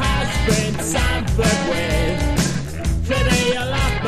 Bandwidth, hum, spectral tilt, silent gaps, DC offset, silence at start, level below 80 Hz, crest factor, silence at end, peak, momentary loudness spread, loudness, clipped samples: 14.5 kHz; none; -4.5 dB/octave; none; under 0.1%; 0 s; -24 dBFS; 14 dB; 0 s; -4 dBFS; 4 LU; -19 LUFS; under 0.1%